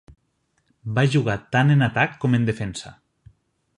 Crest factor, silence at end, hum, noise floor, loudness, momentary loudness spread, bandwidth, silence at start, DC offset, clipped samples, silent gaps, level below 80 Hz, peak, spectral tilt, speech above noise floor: 20 dB; 0.85 s; none; -69 dBFS; -21 LUFS; 16 LU; 10.5 kHz; 0.85 s; under 0.1%; under 0.1%; none; -52 dBFS; -4 dBFS; -6.5 dB/octave; 49 dB